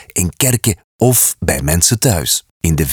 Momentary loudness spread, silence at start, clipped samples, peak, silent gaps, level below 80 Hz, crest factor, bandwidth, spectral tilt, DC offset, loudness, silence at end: 7 LU; 0.15 s; under 0.1%; 0 dBFS; 0.84-0.99 s, 2.51-2.60 s; -32 dBFS; 14 dB; over 20 kHz; -3.5 dB/octave; under 0.1%; -13 LUFS; 0 s